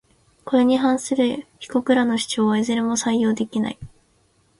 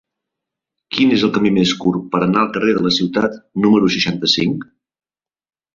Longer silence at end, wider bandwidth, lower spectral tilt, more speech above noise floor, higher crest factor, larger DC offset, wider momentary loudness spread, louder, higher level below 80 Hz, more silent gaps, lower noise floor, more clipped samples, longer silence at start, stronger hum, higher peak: second, 0.75 s vs 1.15 s; first, 11.5 kHz vs 7.6 kHz; about the same, -4.5 dB/octave vs -5.5 dB/octave; second, 41 dB vs 67 dB; about the same, 16 dB vs 16 dB; neither; first, 9 LU vs 6 LU; second, -21 LUFS vs -16 LUFS; about the same, -58 dBFS vs -54 dBFS; neither; second, -61 dBFS vs -82 dBFS; neither; second, 0.45 s vs 0.9 s; neither; about the same, -4 dBFS vs -2 dBFS